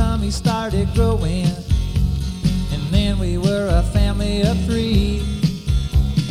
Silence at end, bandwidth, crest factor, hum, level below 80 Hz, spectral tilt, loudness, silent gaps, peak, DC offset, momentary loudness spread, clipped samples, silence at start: 0 s; 15 kHz; 14 dB; none; -22 dBFS; -6.5 dB/octave; -20 LUFS; none; -4 dBFS; under 0.1%; 3 LU; under 0.1%; 0 s